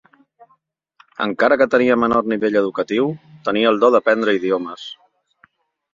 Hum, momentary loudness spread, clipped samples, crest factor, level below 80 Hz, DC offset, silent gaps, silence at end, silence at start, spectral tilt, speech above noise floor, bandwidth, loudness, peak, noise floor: none; 13 LU; under 0.1%; 18 dB; -60 dBFS; under 0.1%; none; 1 s; 1.2 s; -6 dB/octave; 45 dB; 7.6 kHz; -17 LUFS; -2 dBFS; -62 dBFS